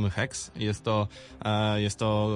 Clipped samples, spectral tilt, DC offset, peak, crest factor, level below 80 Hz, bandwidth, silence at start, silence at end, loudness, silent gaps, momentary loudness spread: under 0.1%; -5.5 dB/octave; under 0.1%; -14 dBFS; 14 dB; -52 dBFS; 11 kHz; 0 s; 0 s; -29 LUFS; none; 6 LU